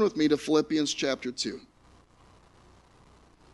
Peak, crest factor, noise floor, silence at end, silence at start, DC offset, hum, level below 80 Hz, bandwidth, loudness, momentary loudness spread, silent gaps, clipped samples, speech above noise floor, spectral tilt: -12 dBFS; 18 dB; -59 dBFS; 1.95 s; 0 s; under 0.1%; 60 Hz at -65 dBFS; -62 dBFS; 11.5 kHz; -27 LUFS; 9 LU; none; under 0.1%; 31 dB; -4 dB/octave